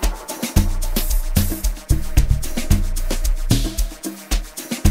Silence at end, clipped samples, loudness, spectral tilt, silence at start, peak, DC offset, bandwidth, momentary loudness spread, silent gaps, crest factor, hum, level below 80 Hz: 0 s; under 0.1%; -22 LUFS; -4.5 dB/octave; 0 s; 0 dBFS; under 0.1%; 16.5 kHz; 6 LU; none; 18 dB; none; -20 dBFS